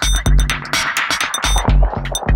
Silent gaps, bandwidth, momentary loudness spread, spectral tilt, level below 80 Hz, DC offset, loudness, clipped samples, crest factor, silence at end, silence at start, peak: none; 17 kHz; 2 LU; -3 dB/octave; -18 dBFS; under 0.1%; -17 LUFS; under 0.1%; 14 dB; 0 s; 0 s; 0 dBFS